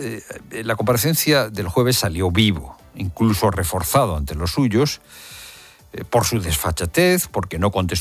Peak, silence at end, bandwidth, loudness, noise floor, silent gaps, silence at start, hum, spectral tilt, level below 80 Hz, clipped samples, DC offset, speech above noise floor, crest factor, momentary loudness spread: -2 dBFS; 0 s; 16 kHz; -19 LUFS; -43 dBFS; none; 0 s; none; -4.5 dB/octave; -34 dBFS; under 0.1%; under 0.1%; 24 dB; 18 dB; 17 LU